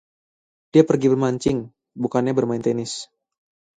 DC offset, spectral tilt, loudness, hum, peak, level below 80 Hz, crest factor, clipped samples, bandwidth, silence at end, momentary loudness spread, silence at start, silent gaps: under 0.1%; -6.5 dB/octave; -21 LUFS; none; -2 dBFS; -56 dBFS; 22 dB; under 0.1%; 9.4 kHz; 0.75 s; 14 LU; 0.75 s; none